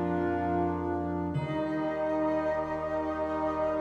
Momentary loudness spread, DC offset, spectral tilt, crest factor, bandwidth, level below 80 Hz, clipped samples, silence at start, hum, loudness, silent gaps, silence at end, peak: 3 LU; under 0.1%; -8.5 dB/octave; 12 dB; 8 kHz; -52 dBFS; under 0.1%; 0 s; none; -31 LUFS; none; 0 s; -18 dBFS